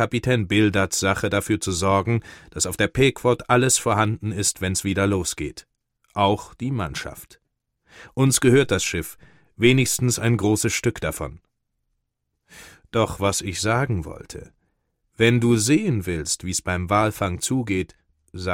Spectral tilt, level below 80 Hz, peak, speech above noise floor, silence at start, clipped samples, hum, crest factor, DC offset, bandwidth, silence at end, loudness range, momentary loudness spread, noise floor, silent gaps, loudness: -4.5 dB/octave; -46 dBFS; -4 dBFS; 55 dB; 0 s; under 0.1%; none; 20 dB; under 0.1%; 16.5 kHz; 0 s; 6 LU; 14 LU; -77 dBFS; none; -21 LUFS